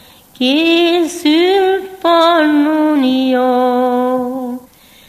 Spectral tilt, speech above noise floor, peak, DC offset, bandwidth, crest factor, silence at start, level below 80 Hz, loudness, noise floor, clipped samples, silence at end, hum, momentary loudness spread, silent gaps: -3 dB/octave; 30 dB; 0 dBFS; under 0.1%; 15 kHz; 12 dB; 0.4 s; -58 dBFS; -13 LUFS; -42 dBFS; under 0.1%; 0.5 s; none; 8 LU; none